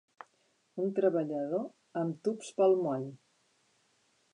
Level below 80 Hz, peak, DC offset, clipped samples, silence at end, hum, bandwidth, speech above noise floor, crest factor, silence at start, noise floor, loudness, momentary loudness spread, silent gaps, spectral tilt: -90 dBFS; -16 dBFS; under 0.1%; under 0.1%; 1.15 s; none; 11 kHz; 42 dB; 18 dB; 0.75 s; -73 dBFS; -32 LUFS; 12 LU; none; -7 dB/octave